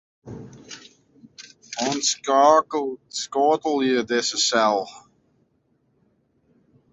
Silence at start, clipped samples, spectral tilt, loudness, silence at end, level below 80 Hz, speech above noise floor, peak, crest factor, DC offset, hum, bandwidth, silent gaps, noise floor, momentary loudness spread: 0.25 s; under 0.1%; -2 dB/octave; -21 LUFS; 1.95 s; -66 dBFS; 45 dB; -4 dBFS; 20 dB; under 0.1%; none; 8.4 kHz; none; -67 dBFS; 24 LU